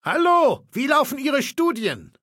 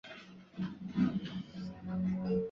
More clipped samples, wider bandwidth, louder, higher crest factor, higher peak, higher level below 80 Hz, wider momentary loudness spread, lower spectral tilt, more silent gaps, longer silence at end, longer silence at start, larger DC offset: neither; first, 17 kHz vs 6.6 kHz; first, -20 LUFS vs -37 LUFS; about the same, 16 dB vs 16 dB; first, -4 dBFS vs -20 dBFS; second, -66 dBFS vs -60 dBFS; second, 9 LU vs 16 LU; second, -4 dB/octave vs -7.5 dB/octave; neither; first, 0.15 s vs 0 s; about the same, 0.05 s vs 0.05 s; neither